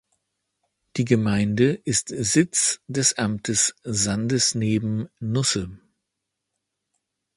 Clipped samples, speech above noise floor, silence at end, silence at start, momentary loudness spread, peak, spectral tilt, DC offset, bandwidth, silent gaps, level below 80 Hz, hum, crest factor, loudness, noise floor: under 0.1%; 59 dB; 1.6 s; 0.95 s; 8 LU; -4 dBFS; -4 dB/octave; under 0.1%; 11.5 kHz; none; -52 dBFS; none; 20 dB; -22 LUFS; -81 dBFS